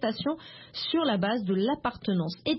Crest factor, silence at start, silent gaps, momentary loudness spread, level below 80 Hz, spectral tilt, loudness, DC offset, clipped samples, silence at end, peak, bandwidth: 16 dB; 0 s; none; 8 LU; -62 dBFS; -9.5 dB/octave; -29 LUFS; under 0.1%; under 0.1%; 0 s; -12 dBFS; 5.8 kHz